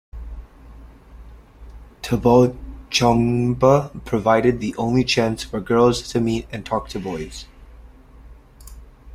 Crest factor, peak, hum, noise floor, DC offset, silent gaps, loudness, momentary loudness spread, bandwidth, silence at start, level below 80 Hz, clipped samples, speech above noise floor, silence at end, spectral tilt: 20 dB; -2 dBFS; none; -44 dBFS; under 0.1%; none; -19 LUFS; 19 LU; 15.5 kHz; 0.15 s; -40 dBFS; under 0.1%; 26 dB; 0 s; -6 dB/octave